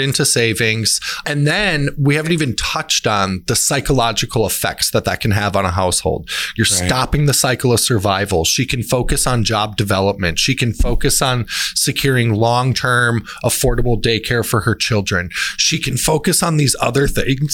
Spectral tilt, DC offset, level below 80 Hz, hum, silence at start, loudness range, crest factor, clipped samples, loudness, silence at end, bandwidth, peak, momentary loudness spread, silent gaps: -3.5 dB/octave; under 0.1%; -30 dBFS; none; 0 s; 1 LU; 14 dB; under 0.1%; -16 LUFS; 0 s; 18 kHz; -2 dBFS; 4 LU; none